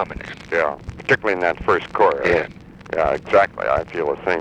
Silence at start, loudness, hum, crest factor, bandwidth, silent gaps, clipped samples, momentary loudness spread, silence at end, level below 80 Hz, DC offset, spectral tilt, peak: 0 s; -20 LUFS; none; 18 dB; 9.6 kHz; none; under 0.1%; 11 LU; 0 s; -42 dBFS; under 0.1%; -6 dB/octave; -2 dBFS